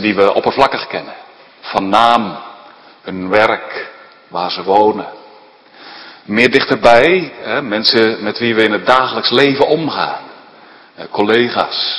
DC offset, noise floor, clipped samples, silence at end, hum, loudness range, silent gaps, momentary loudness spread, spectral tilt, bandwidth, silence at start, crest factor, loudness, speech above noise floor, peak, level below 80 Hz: under 0.1%; -42 dBFS; 0.4%; 0 s; none; 5 LU; none; 20 LU; -5 dB/octave; 11 kHz; 0 s; 14 dB; -13 LUFS; 29 dB; 0 dBFS; -50 dBFS